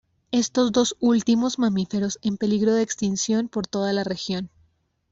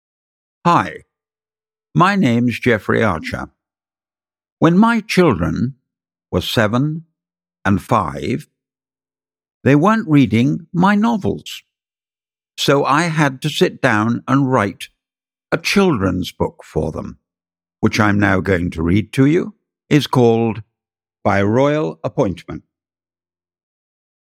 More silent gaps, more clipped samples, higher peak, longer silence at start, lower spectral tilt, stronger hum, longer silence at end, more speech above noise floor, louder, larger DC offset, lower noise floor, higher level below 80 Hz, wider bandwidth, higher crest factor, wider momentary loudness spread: second, none vs 4.52-4.57 s, 9.54-9.61 s; neither; second, -8 dBFS vs 0 dBFS; second, 0.3 s vs 0.65 s; second, -4.5 dB/octave vs -6.5 dB/octave; neither; second, 0.65 s vs 1.8 s; second, 42 dB vs over 74 dB; second, -23 LUFS vs -16 LUFS; neither; second, -65 dBFS vs under -90 dBFS; second, -60 dBFS vs -44 dBFS; second, 8 kHz vs 15.5 kHz; about the same, 16 dB vs 18 dB; second, 7 LU vs 12 LU